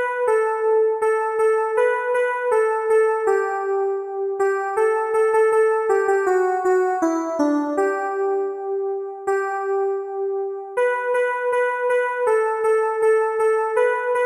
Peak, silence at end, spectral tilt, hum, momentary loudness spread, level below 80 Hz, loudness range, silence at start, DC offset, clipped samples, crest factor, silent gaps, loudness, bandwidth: -8 dBFS; 0 s; -3.5 dB/octave; none; 6 LU; -74 dBFS; 4 LU; 0 s; under 0.1%; under 0.1%; 12 dB; none; -20 LUFS; 11 kHz